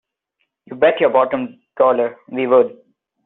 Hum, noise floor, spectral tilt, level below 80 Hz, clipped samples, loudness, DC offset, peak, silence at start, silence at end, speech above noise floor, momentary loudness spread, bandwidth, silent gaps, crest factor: none; -72 dBFS; -3.5 dB/octave; -64 dBFS; under 0.1%; -17 LUFS; under 0.1%; -2 dBFS; 0.7 s; 0.55 s; 56 dB; 10 LU; 4 kHz; none; 16 dB